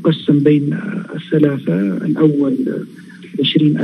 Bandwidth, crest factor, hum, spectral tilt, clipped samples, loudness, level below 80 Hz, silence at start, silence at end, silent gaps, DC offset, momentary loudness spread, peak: 5.4 kHz; 14 dB; none; -8.5 dB/octave; under 0.1%; -16 LUFS; -66 dBFS; 0 s; 0 s; none; under 0.1%; 12 LU; 0 dBFS